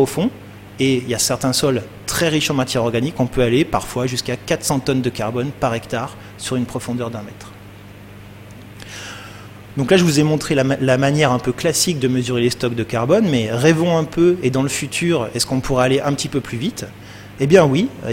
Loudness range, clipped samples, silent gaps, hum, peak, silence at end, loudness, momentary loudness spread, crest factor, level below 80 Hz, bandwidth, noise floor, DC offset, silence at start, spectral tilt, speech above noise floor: 9 LU; under 0.1%; none; 50 Hz at -40 dBFS; 0 dBFS; 0 s; -18 LUFS; 17 LU; 18 dB; -44 dBFS; 16.5 kHz; -38 dBFS; under 0.1%; 0 s; -5 dB/octave; 21 dB